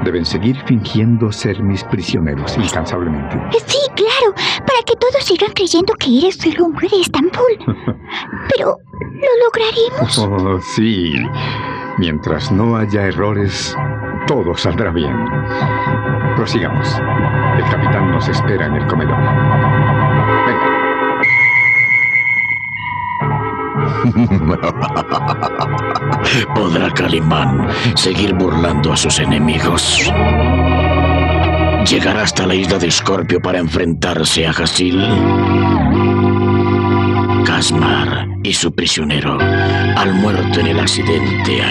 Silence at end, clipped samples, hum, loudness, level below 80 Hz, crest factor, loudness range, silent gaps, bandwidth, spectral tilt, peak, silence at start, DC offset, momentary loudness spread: 0 s; under 0.1%; none; -14 LUFS; -34 dBFS; 12 dB; 4 LU; none; 12.5 kHz; -5 dB/octave; -2 dBFS; 0 s; under 0.1%; 6 LU